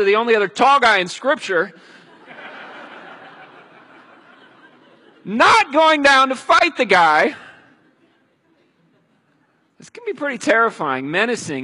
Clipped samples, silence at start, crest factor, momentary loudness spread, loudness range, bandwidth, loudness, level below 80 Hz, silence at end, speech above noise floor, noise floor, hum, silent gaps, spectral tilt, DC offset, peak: under 0.1%; 0 s; 18 dB; 24 LU; 13 LU; 11.5 kHz; -15 LUFS; -60 dBFS; 0 s; 45 dB; -61 dBFS; none; none; -3 dB/octave; under 0.1%; -2 dBFS